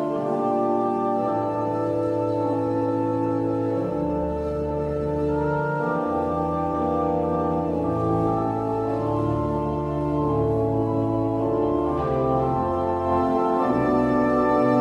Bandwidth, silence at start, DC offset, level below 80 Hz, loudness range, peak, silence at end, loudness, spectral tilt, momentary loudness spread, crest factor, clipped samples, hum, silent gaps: 9.8 kHz; 0 s; under 0.1%; -42 dBFS; 2 LU; -8 dBFS; 0 s; -23 LUFS; -9.5 dB/octave; 4 LU; 14 dB; under 0.1%; none; none